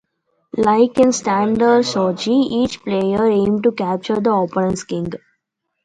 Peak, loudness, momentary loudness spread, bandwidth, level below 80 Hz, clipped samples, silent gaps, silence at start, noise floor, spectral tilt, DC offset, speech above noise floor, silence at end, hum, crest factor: -2 dBFS; -17 LUFS; 9 LU; 10.5 kHz; -50 dBFS; under 0.1%; none; 0.55 s; -74 dBFS; -5.5 dB/octave; under 0.1%; 58 dB; 0.65 s; none; 16 dB